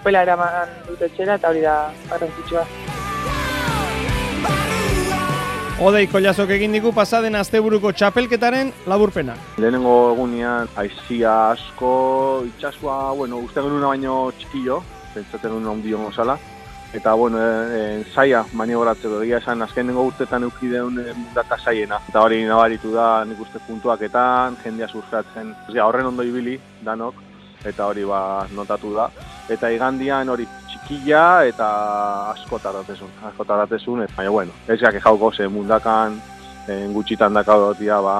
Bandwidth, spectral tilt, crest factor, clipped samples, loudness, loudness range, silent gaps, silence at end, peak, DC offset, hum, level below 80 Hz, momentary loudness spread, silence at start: 14.5 kHz; -5.5 dB/octave; 18 dB; under 0.1%; -19 LUFS; 6 LU; none; 0 s; 0 dBFS; under 0.1%; none; -40 dBFS; 13 LU; 0 s